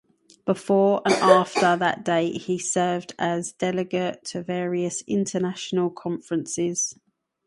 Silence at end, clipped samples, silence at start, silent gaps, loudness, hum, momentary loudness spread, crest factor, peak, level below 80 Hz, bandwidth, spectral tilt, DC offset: 0.55 s; under 0.1%; 0.45 s; none; -24 LUFS; none; 10 LU; 22 dB; -2 dBFS; -68 dBFS; 11.5 kHz; -4.5 dB/octave; under 0.1%